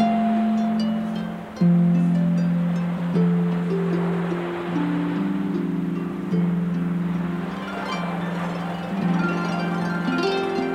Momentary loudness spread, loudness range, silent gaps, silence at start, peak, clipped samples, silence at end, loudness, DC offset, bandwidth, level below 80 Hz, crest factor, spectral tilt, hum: 7 LU; 4 LU; none; 0 s; -8 dBFS; under 0.1%; 0 s; -23 LUFS; under 0.1%; 7.4 kHz; -56 dBFS; 14 dB; -8 dB/octave; none